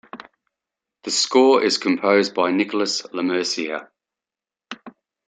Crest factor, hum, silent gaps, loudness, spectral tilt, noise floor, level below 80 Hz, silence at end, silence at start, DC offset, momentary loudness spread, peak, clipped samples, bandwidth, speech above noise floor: 18 dB; none; none; -19 LUFS; -3 dB/octave; -90 dBFS; -70 dBFS; 0.4 s; 0.15 s; under 0.1%; 22 LU; -4 dBFS; under 0.1%; 9.4 kHz; 70 dB